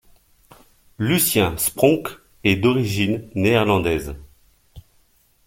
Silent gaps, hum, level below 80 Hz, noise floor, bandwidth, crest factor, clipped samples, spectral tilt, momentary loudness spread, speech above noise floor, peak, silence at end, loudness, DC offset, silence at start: none; none; -44 dBFS; -59 dBFS; 17 kHz; 20 dB; under 0.1%; -4.5 dB/octave; 9 LU; 40 dB; -2 dBFS; 0.65 s; -19 LUFS; under 0.1%; 1 s